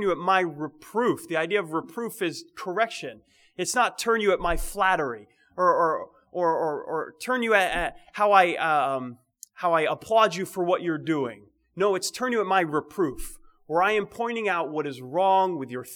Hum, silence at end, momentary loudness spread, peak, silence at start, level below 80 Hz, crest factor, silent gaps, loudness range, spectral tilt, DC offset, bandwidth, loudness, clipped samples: none; 0 s; 11 LU; -4 dBFS; 0 s; -46 dBFS; 22 dB; none; 3 LU; -4 dB/octave; under 0.1%; over 20 kHz; -25 LUFS; under 0.1%